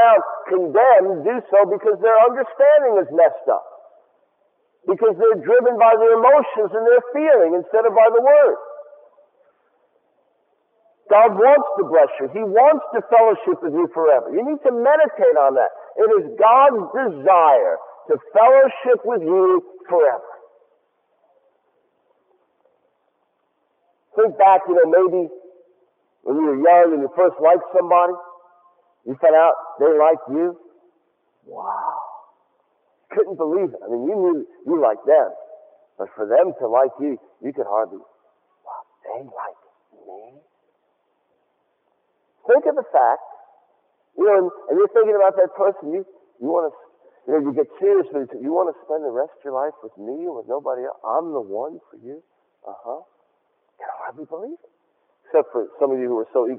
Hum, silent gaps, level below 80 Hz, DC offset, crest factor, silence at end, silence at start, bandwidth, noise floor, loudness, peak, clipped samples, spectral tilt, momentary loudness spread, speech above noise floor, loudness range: none; none; -82 dBFS; under 0.1%; 16 dB; 0 s; 0 s; 3.6 kHz; -68 dBFS; -17 LUFS; -2 dBFS; under 0.1%; -9 dB/octave; 19 LU; 52 dB; 13 LU